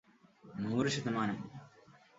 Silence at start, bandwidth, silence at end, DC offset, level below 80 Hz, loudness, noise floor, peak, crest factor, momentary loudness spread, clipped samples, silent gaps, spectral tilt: 0.45 s; 7.6 kHz; 0.25 s; under 0.1%; -70 dBFS; -36 LUFS; -62 dBFS; -18 dBFS; 20 dB; 17 LU; under 0.1%; none; -5 dB/octave